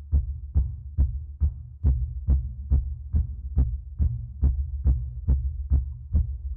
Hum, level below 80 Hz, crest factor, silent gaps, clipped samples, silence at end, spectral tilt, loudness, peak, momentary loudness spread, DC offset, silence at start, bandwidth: none; -26 dBFS; 14 dB; none; under 0.1%; 0 s; -14 dB/octave; -28 LUFS; -12 dBFS; 3 LU; under 0.1%; 0 s; 1.3 kHz